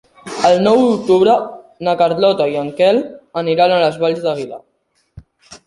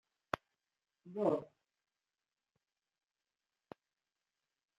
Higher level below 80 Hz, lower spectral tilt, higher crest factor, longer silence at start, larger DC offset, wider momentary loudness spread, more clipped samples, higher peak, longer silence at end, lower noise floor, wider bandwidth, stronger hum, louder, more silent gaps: first, -54 dBFS vs -80 dBFS; second, -5.5 dB/octave vs -7 dB/octave; second, 16 dB vs 28 dB; second, 0.25 s vs 1.05 s; neither; second, 13 LU vs 24 LU; neither; first, 0 dBFS vs -16 dBFS; second, 0.1 s vs 3.35 s; second, -47 dBFS vs under -90 dBFS; second, 11.5 kHz vs 13 kHz; neither; first, -15 LUFS vs -40 LUFS; neither